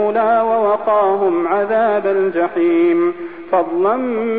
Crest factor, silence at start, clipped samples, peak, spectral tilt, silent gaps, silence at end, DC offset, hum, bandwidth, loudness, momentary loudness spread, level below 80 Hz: 10 dB; 0 s; under 0.1%; -4 dBFS; -10 dB/octave; none; 0 s; 0.6%; none; 4.2 kHz; -16 LUFS; 4 LU; -58 dBFS